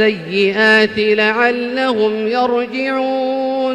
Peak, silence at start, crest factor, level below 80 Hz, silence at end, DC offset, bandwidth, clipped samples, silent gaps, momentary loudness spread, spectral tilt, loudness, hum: -2 dBFS; 0 s; 14 dB; -58 dBFS; 0 s; under 0.1%; 10.5 kHz; under 0.1%; none; 7 LU; -5 dB/octave; -15 LUFS; none